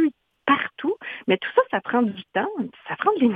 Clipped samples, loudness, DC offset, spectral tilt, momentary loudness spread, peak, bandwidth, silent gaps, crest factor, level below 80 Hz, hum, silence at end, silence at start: under 0.1%; -24 LUFS; under 0.1%; -8 dB/octave; 9 LU; -4 dBFS; 4.6 kHz; none; 18 dB; -68 dBFS; none; 0 s; 0 s